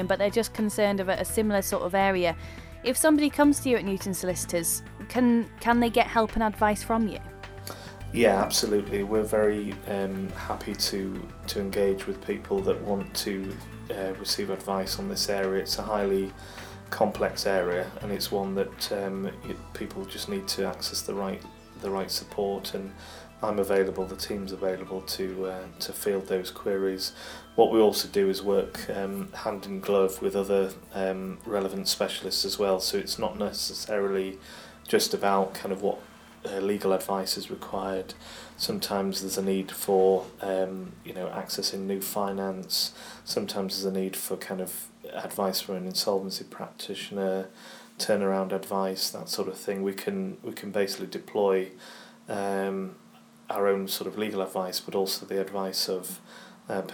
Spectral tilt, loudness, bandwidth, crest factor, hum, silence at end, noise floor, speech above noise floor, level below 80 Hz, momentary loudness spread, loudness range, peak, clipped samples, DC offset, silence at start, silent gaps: -4 dB/octave; -28 LUFS; over 20 kHz; 22 dB; none; 0 s; -53 dBFS; 25 dB; -52 dBFS; 13 LU; 6 LU; -6 dBFS; under 0.1%; under 0.1%; 0 s; none